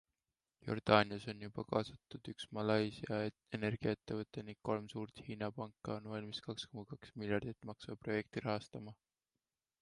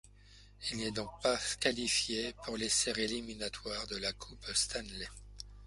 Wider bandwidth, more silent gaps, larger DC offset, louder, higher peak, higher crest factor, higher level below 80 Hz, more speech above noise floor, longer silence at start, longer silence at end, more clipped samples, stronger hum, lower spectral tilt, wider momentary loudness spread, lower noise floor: about the same, 11.5 kHz vs 11.5 kHz; neither; neither; second, -41 LUFS vs -35 LUFS; about the same, -14 dBFS vs -14 dBFS; about the same, 28 dB vs 24 dB; second, -70 dBFS vs -56 dBFS; first, over 50 dB vs 22 dB; first, 0.65 s vs 0.05 s; first, 0.9 s vs 0 s; neither; second, none vs 50 Hz at -55 dBFS; first, -6.5 dB/octave vs -1.5 dB/octave; about the same, 14 LU vs 13 LU; first, under -90 dBFS vs -58 dBFS